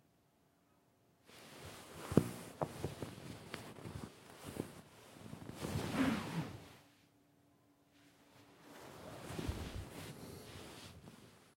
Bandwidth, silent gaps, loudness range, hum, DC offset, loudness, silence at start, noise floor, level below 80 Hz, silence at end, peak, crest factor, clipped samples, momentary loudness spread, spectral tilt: 16.5 kHz; none; 8 LU; none; under 0.1%; -44 LUFS; 1.25 s; -74 dBFS; -62 dBFS; 0.05 s; -10 dBFS; 34 dB; under 0.1%; 22 LU; -6 dB/octave